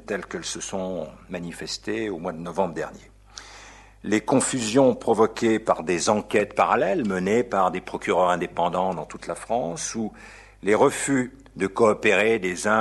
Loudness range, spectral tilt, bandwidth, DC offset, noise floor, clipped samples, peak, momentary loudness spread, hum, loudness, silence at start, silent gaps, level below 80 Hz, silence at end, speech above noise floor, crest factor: 8 LU; -4.5 dB/octave; 12 kHz; under 0.1%; -47 dBFS; under 0.1%; -4 dBFS; 14 LU; none; -24 LUFS; 0.1 s; none; -54 dBFS; 0 s; 23 dB; 20 dB